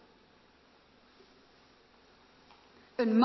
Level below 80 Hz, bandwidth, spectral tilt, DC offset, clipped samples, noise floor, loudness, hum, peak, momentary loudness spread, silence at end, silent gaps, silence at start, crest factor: -76 dBFS; 6 kHz; -5 dB/octave; under 0.1%; under 0.1%; -63 dBFS; -33 LUFS; none; -14 dBFS; 25 LU; 0 s; none; 3 s; 22 dB